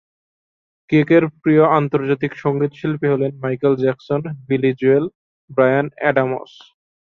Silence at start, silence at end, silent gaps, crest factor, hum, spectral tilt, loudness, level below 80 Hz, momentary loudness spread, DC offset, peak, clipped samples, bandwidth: 0.9 s; 0.65 s; 5.15-5.48 s; 16 dB; none; -9.5 dB/octave; -18 LUFS; -60 dBFS; 9 LU; under 0.1%; -2 dBFS; under 0.1%; 6.4 kHz